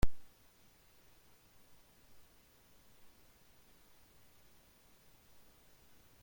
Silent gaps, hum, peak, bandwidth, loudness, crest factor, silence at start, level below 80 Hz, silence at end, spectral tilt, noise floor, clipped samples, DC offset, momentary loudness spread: none; none; -16 dBFS; 16.5 kHz; -60 LUFS; 24 dB; 0.05 s; -50 dBFS; 6 s; -5.5 dB/octave; -65 dBFS; under 0.1%; under 0.1%; 1 LU